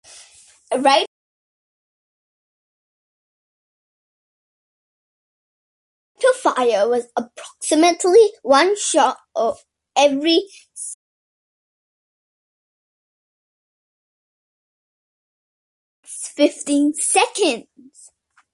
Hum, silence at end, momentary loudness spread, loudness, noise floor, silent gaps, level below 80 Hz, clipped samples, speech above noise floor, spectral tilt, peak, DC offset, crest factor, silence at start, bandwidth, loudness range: none; 0.95 s; 16 LU; -17 LUFS; -53 dBFS; 1.07-6.15 s, 10.94-16.03 s; -72 dBFS; under 0.1%; 36 dB; -1 dB/octave; -2 dBFS; under 0.1%; 20 dB; 0.7 s; 11.5 kHz; 11 LU